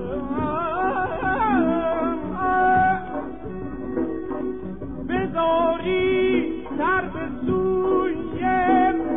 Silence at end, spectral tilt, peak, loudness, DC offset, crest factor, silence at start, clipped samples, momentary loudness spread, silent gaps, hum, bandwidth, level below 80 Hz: 0 s; -10.5 dB/octave; -8 dBFS; -23 LUFS; 0.9%; 14 dB; 0 s; under 0.1%; 12 LU; none; none; 3.9 kHz; -44 dBFS